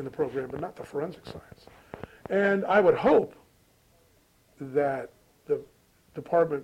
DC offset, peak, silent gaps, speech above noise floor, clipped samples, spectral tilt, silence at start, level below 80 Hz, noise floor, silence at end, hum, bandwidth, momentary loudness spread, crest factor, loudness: under 0.1%; -10 dBFS; none; 37 dB; under 0.1%; -7.5 dB/octave; 0 s; -62 dBFS; -63 dBFS; 0 s; none; 15 kHz; 23 LU; 20 dB; -27 LUFS